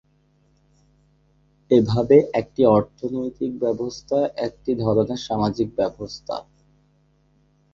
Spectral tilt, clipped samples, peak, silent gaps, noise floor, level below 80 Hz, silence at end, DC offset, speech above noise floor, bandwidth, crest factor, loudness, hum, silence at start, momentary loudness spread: -7.5 dB/octave; under 0.1%; -2 dBFS; none; -61 dBFS; -52 dBFS; 1.3 s; under 0.1%; 41 dB; 7.4 kHz; 20 dB; -22 LUFS; none; 1.7 s; 13 LU